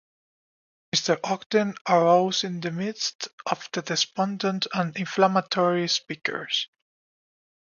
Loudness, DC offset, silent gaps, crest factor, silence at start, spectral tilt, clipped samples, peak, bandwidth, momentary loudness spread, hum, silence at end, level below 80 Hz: -25 LUFS; under 0.1%; 1.46-1.50 s, 1.81-1.85 s, 3.15-3.19 s, 3.33-3.38 s; 20 dB; 0.95 s; -4 dB/octave; under 0.1%; -6 dBFS; 7.4 kHz; 9 LU; none; 1.05 s; -74 dBFS